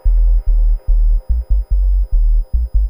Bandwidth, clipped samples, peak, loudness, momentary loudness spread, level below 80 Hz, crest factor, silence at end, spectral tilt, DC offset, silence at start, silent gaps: 1 kHz; under 0.1%; -4 dBFS; -18 LUFS; 3 LU; -12 dBFS; 8 dB; 0 s; -9.5 dB/octave; under 0.1%; 0.05 s; none